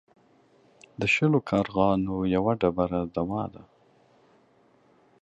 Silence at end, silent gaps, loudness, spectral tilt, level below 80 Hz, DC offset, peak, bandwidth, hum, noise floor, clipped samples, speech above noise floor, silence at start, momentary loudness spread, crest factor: 1.6 s; none; -26 LUFS; -7 dB/octave; -52 dBFS; under 0.1%; -8 dBFS; 8.4 kHz; none; -62 dBFS; under 0.1%; 36 dB; 1 s; 8 LU; 20 dB